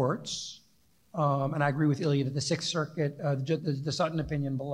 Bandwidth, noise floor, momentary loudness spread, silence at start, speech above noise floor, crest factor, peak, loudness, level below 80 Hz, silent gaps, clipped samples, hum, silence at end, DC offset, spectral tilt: 11 kHz; -67 dBFS; 6 LU; 0 s; 38 dB; 18 dB; -12 dBFS; -30 LUFS; -58 dBFS; none; under 0.1%; none; 0 s; under 0.1%; -5.5 dB/octave